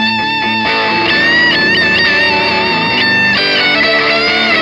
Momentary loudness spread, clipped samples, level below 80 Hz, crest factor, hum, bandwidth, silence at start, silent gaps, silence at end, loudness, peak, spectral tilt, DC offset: 4 LU; under 0.1%; -44 dBFS; 10 dB; none; 12 kHz; 0 s; none; 0 s; -9 LUFS; 0 dBFS; -4 dB/octave; under 0.1%